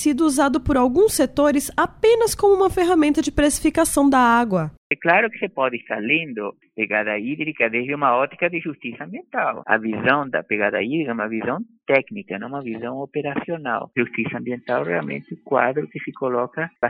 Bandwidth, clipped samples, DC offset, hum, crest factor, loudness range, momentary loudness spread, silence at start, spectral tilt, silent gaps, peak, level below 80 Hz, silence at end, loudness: 16 kHz; under 0.1%; under 0.1%; none; 18 dB; 7 LU; 12 LU; 0 s; -4.5 dB/octave; 4.77-4.90 s; -2 dBFS; -44 dBFS; 0 s; -20 LUFS